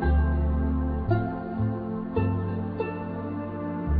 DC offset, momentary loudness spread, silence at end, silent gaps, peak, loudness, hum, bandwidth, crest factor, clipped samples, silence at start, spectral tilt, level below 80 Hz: under 0.1%; 7 LU; 0 s; none; -12 dBFS; -28 LUFS; none; 4.7 kHz; 14 dB; under 0.1%; 0 s; -12.5 dB/octave; -30 dBFS